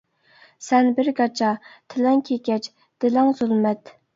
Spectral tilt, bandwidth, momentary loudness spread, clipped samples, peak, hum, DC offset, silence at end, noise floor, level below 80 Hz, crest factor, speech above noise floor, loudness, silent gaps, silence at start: -5.5 dB/octave; 7.6 kHz; 13 LU; under 0.1%; -4 dBFS; none; under 0.1%; 0.4 s; -55 dBFS; -72 dBFS; 18 dB; 34 dB; -21 LUFS; none; 0.6 s